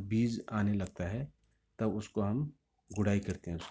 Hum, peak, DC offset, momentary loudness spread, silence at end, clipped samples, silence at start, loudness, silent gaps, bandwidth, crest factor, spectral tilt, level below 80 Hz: none; -16 dBFS; under 0.1%; 9 LU; 0 s; under 0.1%; 0 s; -35 LUFS; none; 8 kHz; 18 dB; -7.5 dB/octave; -52 dBFS